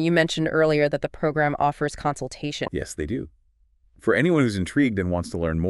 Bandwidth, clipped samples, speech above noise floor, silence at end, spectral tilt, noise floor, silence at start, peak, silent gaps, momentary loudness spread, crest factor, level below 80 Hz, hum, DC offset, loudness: 11.5 kHz; under 0.1%; 38 dB; 0 s; -6 dB/octave; -61 dBFS; 0 s; -4 dBFS; none; 10 LU; 18 dB; -44 dBFS; none; under 0.1%; -24 LUFS